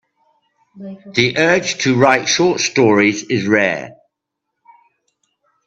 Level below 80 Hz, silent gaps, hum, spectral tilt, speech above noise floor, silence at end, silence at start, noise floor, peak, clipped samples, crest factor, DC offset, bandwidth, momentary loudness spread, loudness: -58 dBFS; none; none; -4 dB/octave; 63 dB; 1.75 s; 0.75 s; -78 dBFS; 0 dBFS; under 0.1%; 18 dB; under 0.1%; 8.4 kHz; 19 LU; -14 LUFS